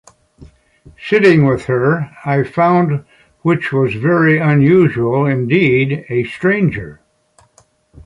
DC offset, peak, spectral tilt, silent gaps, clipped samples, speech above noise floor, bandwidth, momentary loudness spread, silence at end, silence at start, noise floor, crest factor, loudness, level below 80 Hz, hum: under 0.1%; -2 dBFS; -8.5 dB/octave; none; under 0.1%; 40 dB; 10 kHz; 9 LU; 1.1 s; 0.4 s; -54 dBFS; 14 dB; -14 LUFS; -48 dBFS; none